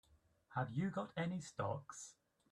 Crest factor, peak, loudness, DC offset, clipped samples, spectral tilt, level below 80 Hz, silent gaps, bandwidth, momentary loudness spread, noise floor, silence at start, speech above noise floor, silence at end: 18 dB; -28 dBFS; -44 LUFS; under 0.1%; under 0.1%; -6 dB/octave; -76 dBFS; none; 11.5 kHz; 12 LU; -71 dBFS; 0.5 s; 28 dB; 0.4 s